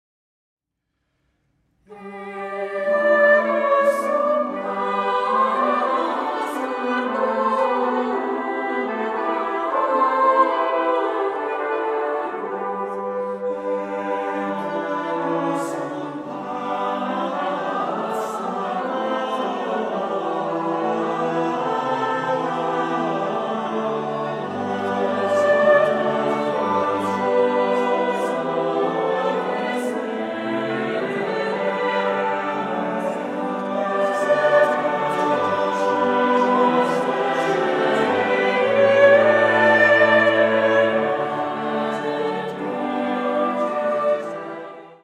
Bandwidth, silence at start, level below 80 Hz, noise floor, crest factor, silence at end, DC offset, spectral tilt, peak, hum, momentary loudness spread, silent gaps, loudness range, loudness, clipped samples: 12.5 kHz; 1.9 s; -70 dBFS; -77 dBFS; 18 dB; 0.1 s; under 0.1%; -5.5 dB/octave; -4 dBFS; none; 10 LU; none; 8 LU; -21 LUFS; under 0.1%